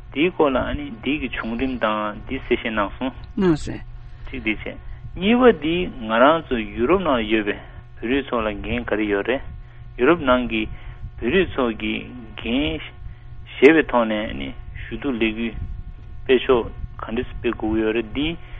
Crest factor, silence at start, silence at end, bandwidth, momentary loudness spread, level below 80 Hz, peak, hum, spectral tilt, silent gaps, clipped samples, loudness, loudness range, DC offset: 22 dB; 0 s; 0 s; 8.2 kHz; 20 LU; -36 dBFS; 0 dBFS; none; -7 dB/octave; none; under 0.1%; -21 LUFS; 5 LU; under 0.1%